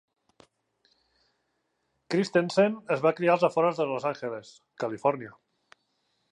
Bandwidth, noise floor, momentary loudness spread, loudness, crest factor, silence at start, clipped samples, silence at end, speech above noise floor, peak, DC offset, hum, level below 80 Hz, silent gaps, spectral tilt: 11 kHz; -77 dBFS; 13 LU; -27 LUFS; 20 dB; 2.1 s; under 0.1%; 1 s; 50 dB; -10 dBFS; under 0.1%; none; -78 dBFS; none; -6 dB/octave